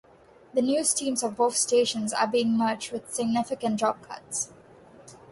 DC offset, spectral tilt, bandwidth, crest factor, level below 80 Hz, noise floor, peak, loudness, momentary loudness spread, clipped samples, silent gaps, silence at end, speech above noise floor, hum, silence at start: under 0.1%; -3 dB/octave; 11.5 kHz; 18 dB; -68 dBFS; -55 dBFS; -8 dBFS; -26 LUFS; 9 LU; under 0.1%; none; 0.15 s; 29 dB; none; 0.55 s